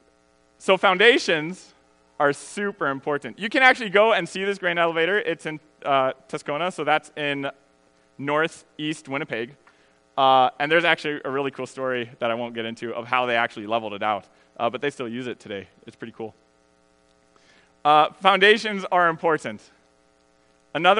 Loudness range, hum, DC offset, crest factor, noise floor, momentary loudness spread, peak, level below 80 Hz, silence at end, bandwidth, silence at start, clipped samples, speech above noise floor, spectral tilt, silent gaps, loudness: 8 LU; none; under 0.1%; 24 dB; -61 dBFS; 17 LU; 0 dBFS; -74 dBFS; 0 s; 10.5 kHz; 0.6 s; under 0.1%; 38 dB; -4 dB/octave; none; -22 LUFS